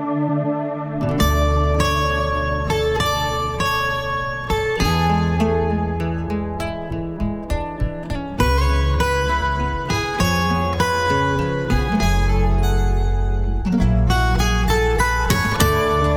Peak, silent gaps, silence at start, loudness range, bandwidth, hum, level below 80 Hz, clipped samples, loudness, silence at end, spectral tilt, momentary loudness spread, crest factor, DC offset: -2 dBFS; none; 0 s; 3 LU; 19.5 kHz; none; -24 dBFS; under 0.1%; -20 LUFS; 0 s; -5.5 dB/octave; 7 LU; 16 dB; under 0.1%